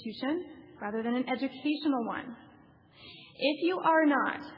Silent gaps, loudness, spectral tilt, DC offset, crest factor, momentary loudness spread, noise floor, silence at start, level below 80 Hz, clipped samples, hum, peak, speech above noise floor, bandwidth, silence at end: none; -30 LUFS; -7.5 dB/octave; under 0.1%; 18 dB; 23 LU; -58 dBFS; 0 s; -76 dBFS; under 0.1%; none; -14 dBFS; 28 dB; 5.6 kHz; 0 s